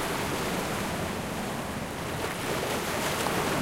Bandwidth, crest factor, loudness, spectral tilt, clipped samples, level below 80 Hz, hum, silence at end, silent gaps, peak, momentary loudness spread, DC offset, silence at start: 16 kHz; 18 dB; -30 LUFS; -4 dB/octave; under 0.1%; -48 dBFS; none; 0 s; none; -12 dBFS; 6 LU; under 0.1%; 0 s